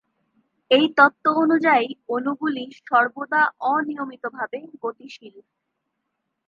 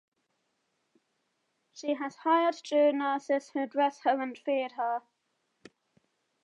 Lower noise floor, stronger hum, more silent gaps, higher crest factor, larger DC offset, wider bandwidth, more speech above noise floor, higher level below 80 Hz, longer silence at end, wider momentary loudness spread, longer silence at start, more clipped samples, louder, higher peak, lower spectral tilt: about the same, -78 dBFS vs -78 dBFS; neither; neither; about the same, 20 dB vs 18 dB; neither; second, 7 kHz vs 9.2 kHz; first, 57 dB vs 50 dB; first, -80 dBFS vs under -90 dBFS; second, 1.05 s vs 1.45 s; first, 15 LU vs 7 LU; second, 0.7 s vs 1.75 s; neither; first, -21 LUFS vs -30 LUFS; first, -2 dBFS vs -14 dBFS; first, -5.5 dB/octave vs -3.5 dB/octave